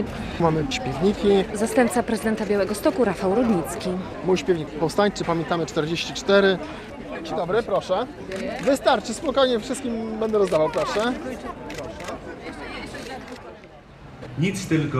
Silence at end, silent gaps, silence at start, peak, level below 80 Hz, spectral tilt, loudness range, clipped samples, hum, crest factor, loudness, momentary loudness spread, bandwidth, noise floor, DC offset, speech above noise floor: 0 s; none; 0 s; -4 dBFS; -46 dBFS; -5.5 dB/octave; 8 LU; under 0.1%; none; 20 dB; -23 LUFS; 14 LU; 15 kHz; -44 dBFS; under 0.1%; 22 dB